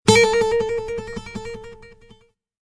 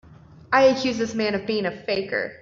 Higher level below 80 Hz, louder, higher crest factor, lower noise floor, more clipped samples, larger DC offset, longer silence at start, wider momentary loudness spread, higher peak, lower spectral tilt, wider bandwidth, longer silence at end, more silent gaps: first, -44 dBFS vs -58 dBFS; about the same, -20 LUFS vs -22 LUFS; about the same, 20 dB vs 20 dB; first, -54 dBFS vs -42 dBFS; neither; neither; about the same, 0.05 s vs 0.1 s; first, 22 LU vs 8 LU; first, 0 dBFS vs -4 dBFS; about the same, -4 dB/octave vs -4.5 dB/octave; first, 11 kHz vs 7.4 kHz; first, 0.75 s vs 0.05 s; neither